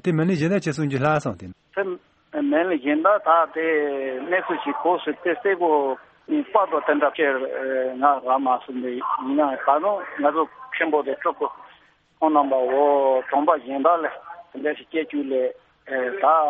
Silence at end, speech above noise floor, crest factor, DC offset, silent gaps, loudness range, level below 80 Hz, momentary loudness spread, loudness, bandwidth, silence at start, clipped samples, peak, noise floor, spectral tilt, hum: 0 s; 35 dB; 18 dB; under 0.1%; none; 2 LU; -66 dBFS; 10 LU; -22 LUFS; 8.4 kHz; 0.05 s; under 0.1%; -4 dBFS; -56 dBFS; -7 dB/octave; none